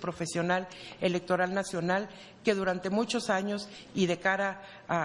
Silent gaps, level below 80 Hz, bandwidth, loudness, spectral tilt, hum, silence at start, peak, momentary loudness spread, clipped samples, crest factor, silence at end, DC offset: none; -66 dBFS; 11.5 kHz; -31 LUFS; -5 dB/octave; none; 0 s; -12 dBFS; 8 LU; under 0.1%; 20 dB; 0 s; under 0.1%